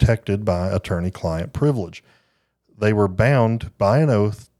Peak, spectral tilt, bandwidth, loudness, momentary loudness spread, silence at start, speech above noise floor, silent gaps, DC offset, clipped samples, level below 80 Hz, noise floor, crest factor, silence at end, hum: -2 dBFS; -8 dB/octave; 12 kHz; -20 LUFS; 8 LU; 0 s; 47 dB; none; under 0.1%; under 0.1%; -36 dBFS; -67 dBFS; 18 dB; 0.15 s; none